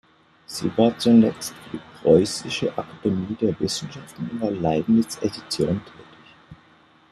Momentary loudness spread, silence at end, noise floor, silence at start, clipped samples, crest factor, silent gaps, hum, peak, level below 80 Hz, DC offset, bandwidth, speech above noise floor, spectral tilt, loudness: 16 LU; 0.55 s; -55 dBFS; 0.5 s; under 0.1%; 20 dB; none; none; -4 dBFS; -56 dBFS; under 0.1%; 13 kHz; 33 dB; -5.5 dB/octave; -22 LUFS